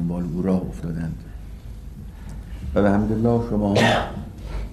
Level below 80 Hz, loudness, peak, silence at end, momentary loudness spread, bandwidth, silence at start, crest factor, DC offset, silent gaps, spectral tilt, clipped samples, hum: -34 dBFS; -22 LUFS; -6 dBFS; 0 s; 21 LU; 13 kHz; 0 s; 16 dB; under 0.1%; none; -6.5 dB/octave; under 0.1%; none